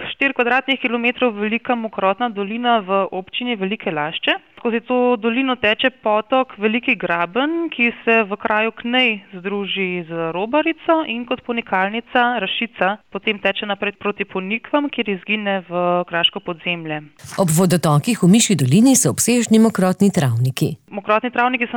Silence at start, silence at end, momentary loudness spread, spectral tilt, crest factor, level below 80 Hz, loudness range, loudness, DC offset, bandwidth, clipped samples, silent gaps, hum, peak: 0 s; 0 s; 9 LU; -4.5 dB/octave; 14 dB; -60 dBFS; 5 LU; -18 LUFS; 0.1%; 20 kHz; under 0.1%; none; none; -4 dBFS